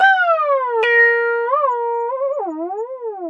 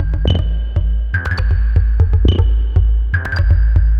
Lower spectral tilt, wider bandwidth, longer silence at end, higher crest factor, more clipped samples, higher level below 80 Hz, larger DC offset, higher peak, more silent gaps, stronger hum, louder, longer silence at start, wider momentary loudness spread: second, -1.5 dB/octave vs -8 dB/octave; first, 7.2 kHz vs 5 kHz; about the same, 0 s vs 0 s; about the same, 14 dB vs 12 dB; neither; second, under -90 dBFS vs -14 dBFS; neither; about the same, -2 dBFS vs -2 dBFS; neither; neither; about the same, -17 LUFS vs -16 LUFS; about the same, 0 s vs 0 s; first, 13 LU vs 5 LU